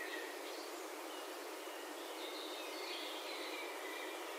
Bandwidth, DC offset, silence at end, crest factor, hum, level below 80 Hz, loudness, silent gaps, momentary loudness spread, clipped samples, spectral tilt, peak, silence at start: 16 kHz; under 0.1%; 0 s; 14 dB; none; under -90 dBFS; -45 LUFS; none; 3 LU; under 0.1%; 1 dB/octave; -32 dBFS; 0 s